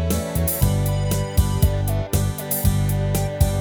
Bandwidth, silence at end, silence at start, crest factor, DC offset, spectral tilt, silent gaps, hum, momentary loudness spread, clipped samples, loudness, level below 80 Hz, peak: over 20 kHz; 0 s; 0 s; 16 dB; under 0.1%; -5.5 dB/octave; none; none; 3 LU; under 0.1%; -21 LUFS; -26 dBFS; -4 dBFS